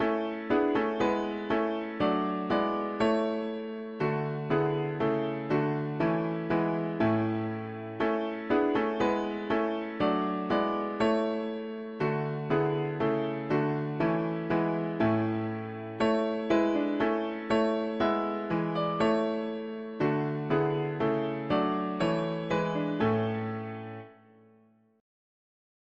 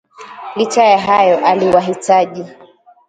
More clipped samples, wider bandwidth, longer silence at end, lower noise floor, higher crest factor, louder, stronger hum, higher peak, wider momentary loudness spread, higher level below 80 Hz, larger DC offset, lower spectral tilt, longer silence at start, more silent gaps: neither; second, 7.8 kHz vs 9.6 kHz; first, 1.85 s vs 0.55 s; first, -63 dBFS vs -32 dBFS; about the same, 16 dB vs 14 dB; second, -30 LUFS vs -12 LUFS; neither; second, -14 dBFS vs 0 dBFS; second, 6 LU vs 18 LU; about the same, -60 dBFS vs -56 dBFS; neither; first, -8 dB/octave vs -4.5 dB/octave; second, 0 s vs 0.2 s; neither